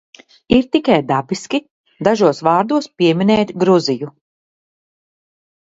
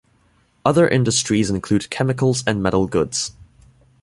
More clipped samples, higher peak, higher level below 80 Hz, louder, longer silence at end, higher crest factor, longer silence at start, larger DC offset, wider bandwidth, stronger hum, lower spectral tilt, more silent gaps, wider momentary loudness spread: neither; about the same, 0 dBFS vs -2 dBFS; second, -50 dBFS vs -44 dBFS; first, -16 LUFS vs -19 LUFS; first, 1.65 s vs 0.7 s; about the same, 16 dB vs 18 dB; second, 0.5 s vs 0.65 s; neither; second, 8 kHz vs 11.5 kHz; neither; about the same, -6 dB/octave vs -5 dB/octave; first, 1.71-1.84 s vs none; about the same, 8 LU vs 7 LU